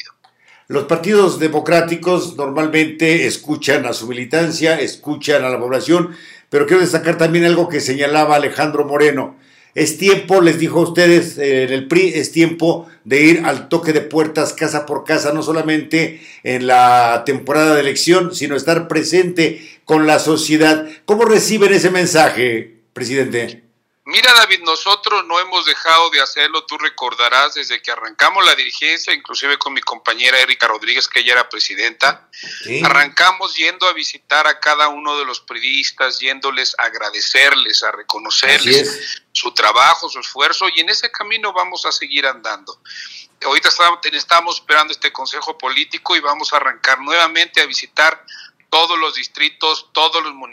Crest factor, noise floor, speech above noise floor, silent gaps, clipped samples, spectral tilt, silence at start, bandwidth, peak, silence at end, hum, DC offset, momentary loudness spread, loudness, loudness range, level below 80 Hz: 14 dB; -50 dBFS; 36 dB; none; under 0.1%; -3 dB/octave; 0.7 s; 16.5 kHz; 0 dBFS; 0.05 s; none; under 0.1%; 9 LU; -14 LUFS; 3 LU; -66 dBFS